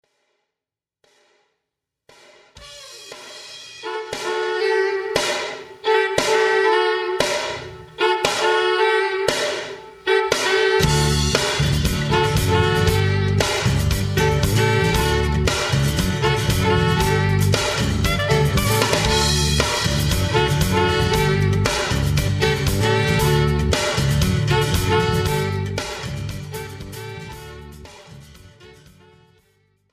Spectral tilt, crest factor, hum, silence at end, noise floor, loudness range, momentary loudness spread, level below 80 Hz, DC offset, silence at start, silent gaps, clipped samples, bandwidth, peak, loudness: -4.5 dB/octave; 18 dB; none; 1.2 s; -88 dBFS; 10 LU; 15 LU; -32 dBFS; under 0.1%; 2.55 s; none; under 0.1%; 16 kHz; -2 dBFS; -19 LUFS